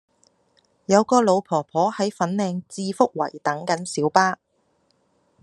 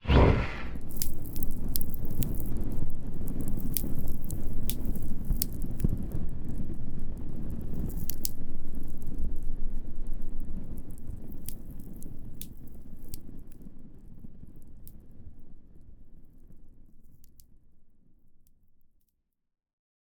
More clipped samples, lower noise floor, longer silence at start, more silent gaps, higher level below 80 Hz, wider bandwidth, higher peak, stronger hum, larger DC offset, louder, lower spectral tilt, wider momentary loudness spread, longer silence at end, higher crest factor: neither; second, -67 dBFS vs -77 dBFS; first, 0.9 s vs 0.05 s; neither; second, -70 dBFS vs -32 dBFS; second, 12 kHz vs over 20 kHz; about the same, 0 dBFS vs -2 dBFS; neither; neither; first, -22 LUFS vs -35 LUFS; about the same, -5 dB/octave vs -5.5 dB/octave; second, 10 LU vs 19 LU; second, 1.1 s vs 2.15 s; about the same, 22 dB vs 24 dB